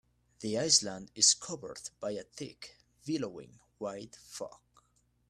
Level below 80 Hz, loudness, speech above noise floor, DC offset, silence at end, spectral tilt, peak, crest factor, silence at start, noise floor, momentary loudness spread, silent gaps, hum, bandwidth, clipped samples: -72 dBFS; -31 LUFS; 38 dB; under 0.1%; 0.75 s; -1.5 dB/octave; -12 dBFS; 24 dB; 0.4 s; -72 dBFS; 21 LU; none; 60 Hz at -70 dBFS; 14 kHz; under 0.1%